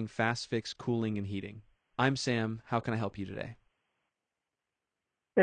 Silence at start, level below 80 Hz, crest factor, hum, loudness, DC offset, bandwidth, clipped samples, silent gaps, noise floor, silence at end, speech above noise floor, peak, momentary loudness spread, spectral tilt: 0 s; -68 dBFS; 22 dB; none; -34 LUFS; under 0.1%; 9.6 kHz; under 0.1%; none; -89 dBFS; 0 s; 55 dB; -12 dBFS; 11 LU; -5.5 dB/octave